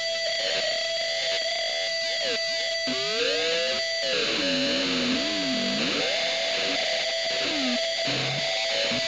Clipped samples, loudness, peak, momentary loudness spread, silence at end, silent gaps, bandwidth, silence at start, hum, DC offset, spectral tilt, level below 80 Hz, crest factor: under 0.1%; -24 LUFS; -12 dBFS; 2 LU; 0 s; none; 13 kHz; 0 s; none; 0.1%; -2 dB/octave; -64 dBFS; 14 dB